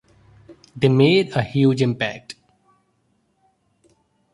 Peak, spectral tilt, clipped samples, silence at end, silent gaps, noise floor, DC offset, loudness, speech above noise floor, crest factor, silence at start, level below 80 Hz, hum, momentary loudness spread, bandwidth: -2 dBFS; -7 dB/octave; under 0.1%; 2 s; none; -66 dBFS; under 0.1%; -18 LUFS; 48 dB; 20 dB; 0.5 s; -58 dBFS; none; 22 LU; 11.5 kHz